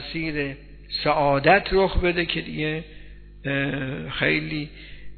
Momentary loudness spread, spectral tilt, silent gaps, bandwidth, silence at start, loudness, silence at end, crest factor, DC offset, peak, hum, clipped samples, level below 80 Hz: 16 LU; -9 dB/octave; none; 4.6 kHz; 0 s; -23 LUFS; 0 s; 22 dB; under 0.1%; -2 dBFS; 50 Hz at -45 dBFS; under 0.1%; -38 dBFS